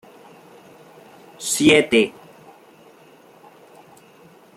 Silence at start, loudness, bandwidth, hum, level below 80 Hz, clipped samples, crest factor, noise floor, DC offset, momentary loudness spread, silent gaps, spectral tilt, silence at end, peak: 1.4 s; -17 LUFS; 16 kHz; none; -60 dBFS; under 0.1%; 22 dB; -49 dBFS; under 0.1%; 11 LU; none; -3 dB/octave; 2.45 s; -2 dBFS